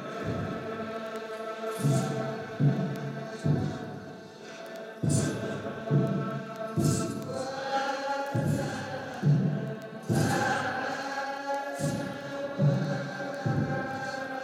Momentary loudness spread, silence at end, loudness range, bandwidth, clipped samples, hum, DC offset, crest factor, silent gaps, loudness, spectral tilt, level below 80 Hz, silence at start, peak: 10 LU; 0 s; 2 LU; 15 kHz; under 0.1%; none; under 0.1%; 16 dB; none; -31 LUFS; -6 dB/octave; -60 dBFS; 0 s; -14 dBFS